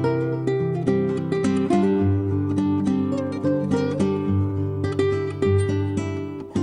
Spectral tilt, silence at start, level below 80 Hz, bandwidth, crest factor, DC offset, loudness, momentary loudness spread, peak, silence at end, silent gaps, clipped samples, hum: -8 dB/octave; 0 s; -52 dBFS; 10.5 kHz; 14 dB; under 0.1%; -23 LUFS; 5 LU; -6 dBFS; 0 s; none; under 0.1%; none